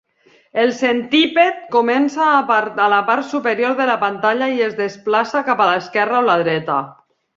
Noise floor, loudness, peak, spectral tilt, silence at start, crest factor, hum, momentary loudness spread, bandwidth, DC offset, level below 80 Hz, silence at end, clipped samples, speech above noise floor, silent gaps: -54 dBFS; -16 LUFS; -2 dBFS; -5 dB/octave; 0.55 s; 16 dB; none; 5 LU; 7.6 kHz; under 0.1%; -66 dBFS; 0.45 s; under 0.1%; 38 dB; none